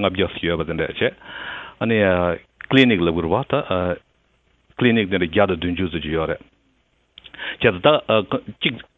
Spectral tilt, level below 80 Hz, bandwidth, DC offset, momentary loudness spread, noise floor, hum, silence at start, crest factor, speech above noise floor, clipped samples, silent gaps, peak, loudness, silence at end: -8 dB/octave; -42 dBFS; 7.4 kHz; under 0.1%; 15 LU; -63 dBFS; none; 0 s; 20 dB; 44 dB; under 0.1%; none; 0 dBFS; -20 LUFS; 0.15 s